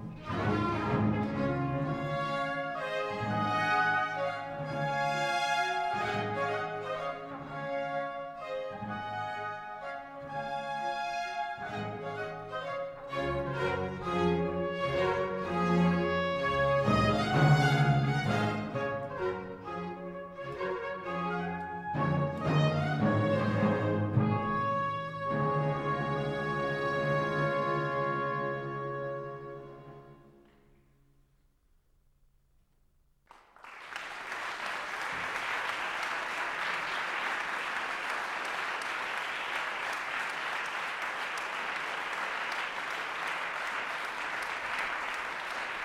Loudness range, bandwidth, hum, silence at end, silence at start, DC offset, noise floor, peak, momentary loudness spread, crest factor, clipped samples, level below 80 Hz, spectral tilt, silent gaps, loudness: 9 LU; 14 kHz; none; 0 s; 0 s; under 0.1%; -68 dBFS; -14 dBFS; 10 LU; 20 dB; under 0.1%; -58 dBFS; -6 dB/octave; none; -32 LUFS